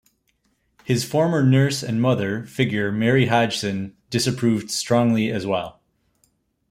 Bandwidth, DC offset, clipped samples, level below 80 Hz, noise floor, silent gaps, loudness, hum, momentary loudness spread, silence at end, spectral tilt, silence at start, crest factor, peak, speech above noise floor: 16 kHz; under 0.1%; under 0.1%; -58 dBFS; -68 dBFS; none; -21 LUFS; none; 9 LU; 1 s; -5.5 dB/octave; 0.85 s; 18 dB; -4 dBFS; 48 dB